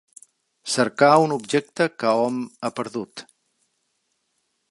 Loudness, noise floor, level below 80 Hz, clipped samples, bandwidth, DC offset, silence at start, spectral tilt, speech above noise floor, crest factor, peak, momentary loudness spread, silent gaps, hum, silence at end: -21 LUFS; -73 dBFS; -76 dBFS; under 0.1%; 11.5 kHz; under 0.1%; 0.65 s; -4.5 dB/octave; 52 dB; 22 dB; -2 dBFS; 17 LU; none; none; 1.5 s